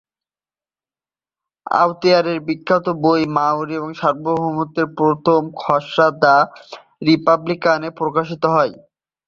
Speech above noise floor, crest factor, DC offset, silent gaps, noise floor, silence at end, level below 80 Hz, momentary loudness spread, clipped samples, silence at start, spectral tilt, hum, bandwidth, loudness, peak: over 73 dB; 18 dB; under 0.1%; none; under -90 dBFS; 0.55 s; -60 dBFS; 8 LU; under 0.1%; 1.65 s; -6.5 dB/octave; none; 7.2 kHz; -17 LUFS; 0 dBFS